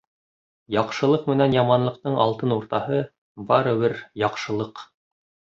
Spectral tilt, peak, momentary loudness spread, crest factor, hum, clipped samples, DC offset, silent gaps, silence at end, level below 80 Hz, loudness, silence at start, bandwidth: -7 dB/octave; -4 dBFS; 10 LU; 20 dB; none; under 0.1%; under 0.1%; 3.18-3.35 s; 0.75 s; -60 dBFS; -22 LUFS; 0.7 s; 7.6 kHz